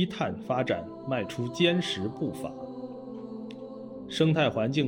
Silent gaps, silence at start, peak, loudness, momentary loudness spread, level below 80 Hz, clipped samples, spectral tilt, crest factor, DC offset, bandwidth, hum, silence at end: none; 0 s; -10 dBFS; -29 LUFS; 16 LU; -66 dBFS; under 0.1%; -6 dB/octave; 20 dB; under 0.1%; 16.5 kHz; none; 0 s